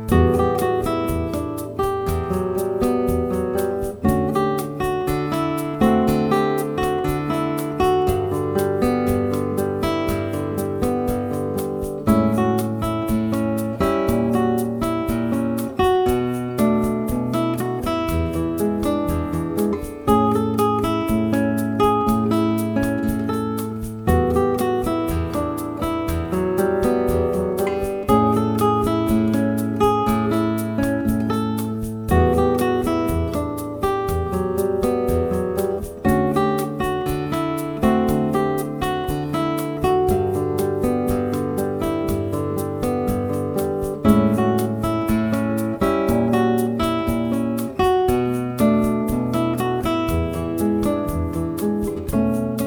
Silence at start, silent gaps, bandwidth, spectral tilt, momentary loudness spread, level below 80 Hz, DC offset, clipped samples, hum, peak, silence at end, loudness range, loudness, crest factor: 0 s; none; over 20 kHz; -7 dB/octave; 6 LU; -36 dBFS; under 0.1%; under 0.1%; none; -2 dBFS; 0 s; 2 LU; -21 LUFS; 18 dB